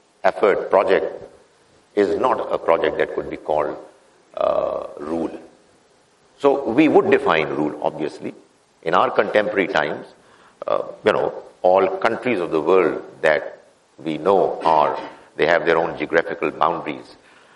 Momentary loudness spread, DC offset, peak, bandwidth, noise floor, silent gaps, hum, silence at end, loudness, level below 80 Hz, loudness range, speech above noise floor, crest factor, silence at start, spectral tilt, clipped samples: 13 LU; under 0.1%; 0 dBFS; 11 kHz; -56 dBFS; none; none; 0.45 s; -20 LUFS; -58 dBFS; 3 LU; 37 dB; 20 dB; 0.25 s; -6 dB/octave; under 0.1%